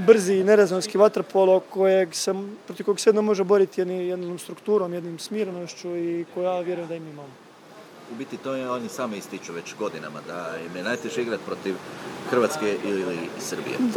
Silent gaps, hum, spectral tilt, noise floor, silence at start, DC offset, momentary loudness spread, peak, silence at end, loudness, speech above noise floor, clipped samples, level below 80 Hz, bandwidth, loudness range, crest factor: none; none; -5 dB/octave; -47 dBFS; 0 s; under 0.1%; 15 LU; -2 dBFS; 0 s; -24 LUFS; 23 dB; under 0.1%; -78 dBFS; 18.5 kHz; 11 LU; 22 dB